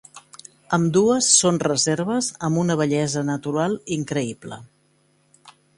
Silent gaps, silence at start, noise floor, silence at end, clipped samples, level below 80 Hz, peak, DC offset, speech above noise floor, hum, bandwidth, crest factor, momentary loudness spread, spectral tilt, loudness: none; 0.15 s; -62 dBFS; 0.25 s; under 0.1%; -60 dBFS; -2 dBFS; under 0.1%; 41 dB; none; 11.5 kHz; 20 dB; 15 LU; -4 dB/octave; -20 LUFS